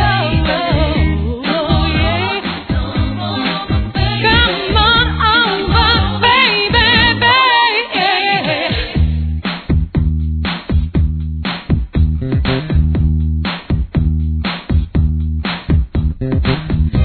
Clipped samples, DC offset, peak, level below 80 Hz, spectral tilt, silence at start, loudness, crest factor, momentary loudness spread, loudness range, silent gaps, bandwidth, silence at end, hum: under 0.1%; under 0.1%; 0 dBFS; -20 dBFS; -8 dB/octave; 0 s; -14 LUFS; 14 dB; 9 LU; 7 LU; none; 4.6 kHz; 0 s; none